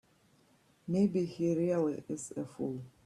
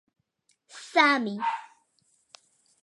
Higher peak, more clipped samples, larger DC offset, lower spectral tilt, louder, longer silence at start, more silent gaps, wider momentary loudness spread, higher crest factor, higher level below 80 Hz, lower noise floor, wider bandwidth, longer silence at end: second, -18 dBFS vs -6 dBFS; neither; neither; first, -7.5 dB/octave vs -3.5 dB/octave; second, -34 LUFS vs -25 LUFS; about the same, 0.85 s vs 0.75 s; neither; second, 10 LU vs 17 LU; second, 16 dB vs 24 dB; first, -72 dBFS vs -88 dBFS; second, -68 dBFS vs -72 dBFS; about the same, 12 kHz vs 11.5 kHz; second, 0.15 s vs 1.2 s